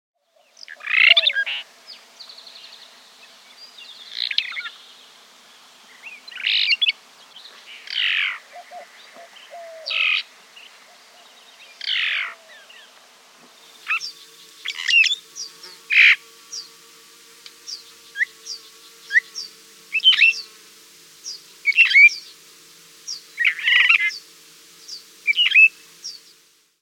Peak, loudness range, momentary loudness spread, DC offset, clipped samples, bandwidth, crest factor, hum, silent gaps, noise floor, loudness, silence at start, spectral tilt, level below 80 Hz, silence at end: 0 dBFS; 12 LU; 27 LU; under 0.1%; under 0.1%; 17 kHz; 22 dB; none; none; -56 dBFS; -16 LUFS; 0.7 s; 3.5 dB/octave; under -90 dBFS; 0.65 s